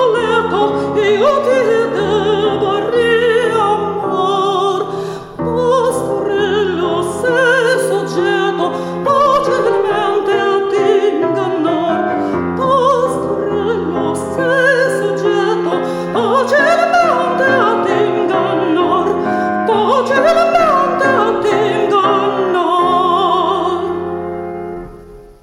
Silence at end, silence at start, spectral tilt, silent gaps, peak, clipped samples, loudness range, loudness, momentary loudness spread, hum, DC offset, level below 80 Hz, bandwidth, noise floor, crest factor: 0.1 s; 0 s; -5 dB/octave; none; 0 dBFS; under 0.1%; 3 LU; -14 LUFS; 6 LU; none; under 0.1%; -48 dBFS; 14.5 kHz; -36 dBFS; 12 dB